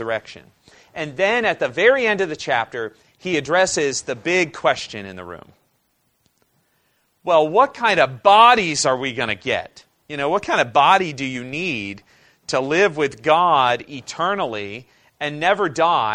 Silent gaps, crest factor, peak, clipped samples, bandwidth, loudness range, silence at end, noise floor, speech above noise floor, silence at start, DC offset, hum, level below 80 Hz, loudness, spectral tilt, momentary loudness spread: none; 20 dB; 0 dBFS; under 0.1%; 11 kHz; 6 LU; 0 s; -67 dBFS; 48 dB; 0 s; under 0.1%; none; -58 dBFS; -18 LUFS; -3.5 dB/octave; 17 LU